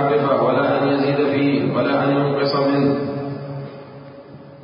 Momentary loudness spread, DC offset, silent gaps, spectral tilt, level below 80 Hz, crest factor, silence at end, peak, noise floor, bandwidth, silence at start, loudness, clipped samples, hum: 18 LU; under 0.1%; none; -12 dB/octave; -60 dBFS; 14 dB; 0 s; -6 dBFS; -39 dBFS; 5.4 kHz; 0 s; -18 LUFS; under 0.1%; none